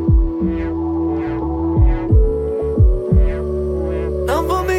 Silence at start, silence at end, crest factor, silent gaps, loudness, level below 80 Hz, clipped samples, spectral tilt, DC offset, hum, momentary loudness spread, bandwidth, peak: 0 s; 0 s; 12 dB; none; -18 LUFS; -18 dBFS; under 0.1%; -8.5 dB/octave; under 0.1%; none; 5 LU; 13.5 kHz; -4 dBFS